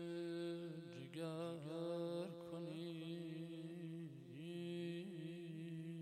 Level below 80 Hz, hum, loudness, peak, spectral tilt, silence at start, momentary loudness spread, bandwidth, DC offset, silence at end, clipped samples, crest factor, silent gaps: under -90 dBFS; none; -49 LUFS; -34 dBFS; -7 dB/octave; 0 s; 6 LU; 14 kHz; under 0.1%; 0 s; under 0.1%; 14 dB; none